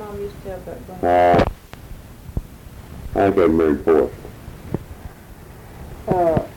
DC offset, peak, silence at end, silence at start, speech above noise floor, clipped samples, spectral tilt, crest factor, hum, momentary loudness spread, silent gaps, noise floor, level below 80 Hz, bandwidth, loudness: under 0.1%; -6 dBFS; 0 s; 0 s; 23 dB; under 0.1%; -7.5 dB/octave; 16 dB; none; 24 LU; none; -40 dBFS; -38 dBFS; 18 kHz; -19 LUFS